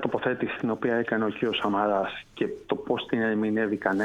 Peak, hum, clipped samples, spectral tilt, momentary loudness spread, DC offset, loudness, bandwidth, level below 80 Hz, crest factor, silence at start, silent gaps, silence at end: -10 dBFS; none; under 0.1%; -7 dB/octave; 7 LU; under 0.1%; -27 LUFS; 9.2 kHz; -62 dBFS; 18 dB; 0 s; none; 0 s